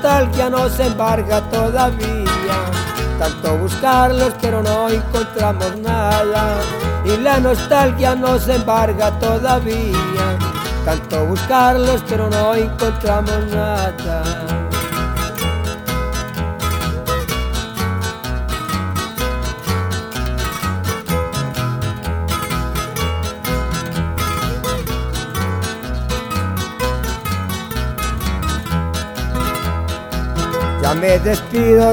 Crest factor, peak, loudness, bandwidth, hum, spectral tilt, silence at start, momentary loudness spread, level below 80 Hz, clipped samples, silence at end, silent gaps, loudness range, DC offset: 16 dB; 0 dBFS; -18 LUFS; over 20 kHz; none; -5.5 dB/octave; 0 s; 8 LU; -26 dBFS; under 0.1%; 0 s; none; 6 LU; under 0.1%